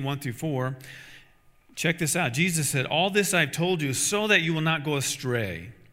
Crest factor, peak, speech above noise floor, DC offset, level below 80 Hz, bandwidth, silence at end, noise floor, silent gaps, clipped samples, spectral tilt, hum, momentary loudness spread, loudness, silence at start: 20 dB; -6 dBFS; 32 dB; under 0.1%; -62 dBFS; 16 kHz; 0.2 s; -57 dBFS; none; under 0.1%; -3.5 dB/octave; none; 12 LU; -25 LUFS; 0 s